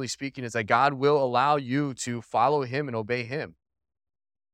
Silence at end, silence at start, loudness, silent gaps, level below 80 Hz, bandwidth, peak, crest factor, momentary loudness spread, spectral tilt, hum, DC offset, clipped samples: 1.05 s; 0 s; -26 LUFS; none; -70 dBFS; 13 kHz; -8 dBFS; 20 dB; 11 LU; -5 dB/octave; none; under 0.1%; under 0.1%